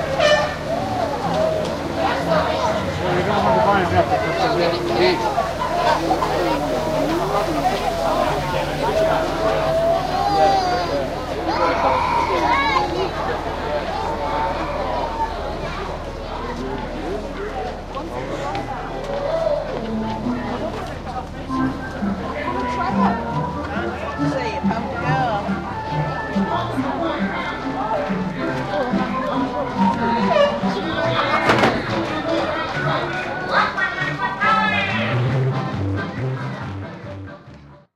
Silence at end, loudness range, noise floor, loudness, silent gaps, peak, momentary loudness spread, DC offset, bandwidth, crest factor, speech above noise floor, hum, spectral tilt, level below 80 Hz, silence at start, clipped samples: 0.15 s; 6 LU; -43 dBFS; -21 LUFS; none; -2 dBFS; 10 LU; under 0.1%; 16 kHz; 18 dB; 24 dB; none; -6 dB/octave; -38 dBFS; 0 s; under 0.1%